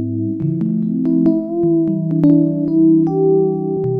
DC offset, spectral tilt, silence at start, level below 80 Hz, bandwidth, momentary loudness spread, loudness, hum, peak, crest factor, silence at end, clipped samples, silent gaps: under 0.1%; -13.5 dB/octave; 0 s; -56 dBFS; 1.9 kHz; 7 LU; -15 LUFS; none; -2 dBFS; 12 dB; 0 s; under 0.1%; none